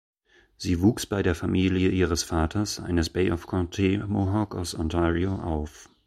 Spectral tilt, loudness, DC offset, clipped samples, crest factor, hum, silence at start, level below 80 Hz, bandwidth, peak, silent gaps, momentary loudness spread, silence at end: -6 dB/octave; -26 LUFS; under 0.1%; under 0.1%; 16 dB; none; 0.6 s; -40 dBFS; 15.5 kHz; -8 dBFS; none; 7 LU; 0.2 s